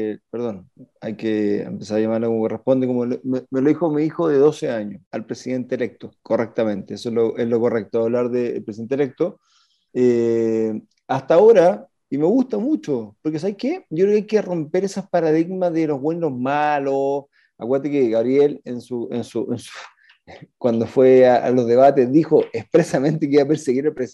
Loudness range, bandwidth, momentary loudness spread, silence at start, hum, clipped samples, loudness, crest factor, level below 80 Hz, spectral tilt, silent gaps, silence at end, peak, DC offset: 6 LU; 11.5 kHz; 14 LU; 0 s; none; under 0.1%; -19 LUFS; 16 dB; -68 dBFS; -7.5 dB/octave; 5.06-5.11 s; 0.05 s; -2 dBFS; under 0.1%